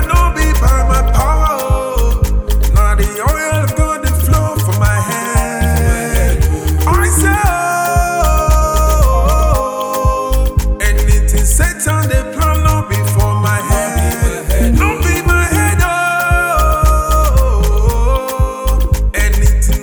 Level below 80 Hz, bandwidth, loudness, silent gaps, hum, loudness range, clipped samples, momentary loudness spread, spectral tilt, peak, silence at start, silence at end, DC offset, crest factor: -14 dBFS; over 20 kHz; -13 LUFS; none; none; 2 LU; under 0.1%; 4 LU; -5 dB/octave; 0 dBFS; 0 s; 0 s; under 0.1%; 10 dB